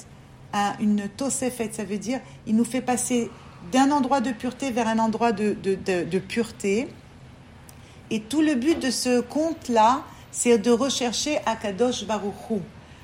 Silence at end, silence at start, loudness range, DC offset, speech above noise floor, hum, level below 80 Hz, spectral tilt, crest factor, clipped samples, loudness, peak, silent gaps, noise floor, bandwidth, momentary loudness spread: 0.05 s; 0 s; 4 LU; under 0.1%; 23 dB; none; -56 dBFS; -4 dB/octave; 18 dB; under 0.1%; -24 LUFS; -6 dBFS; none; -46 dBFS; 16 kHz; 10 LU